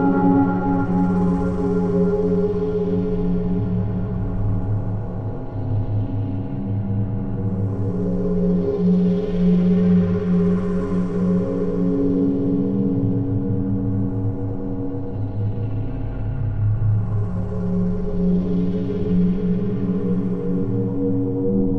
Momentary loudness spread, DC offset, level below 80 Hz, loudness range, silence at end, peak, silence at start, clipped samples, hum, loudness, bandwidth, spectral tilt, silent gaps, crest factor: 8 LU; under 0.1%; -32 dBFS; 6 LU; 0 s; -6 dBFS; 0 s; under 0.1%; none; -21 LUFS; 3.8 kHz; -11.5 dB/octave; none; 14 dB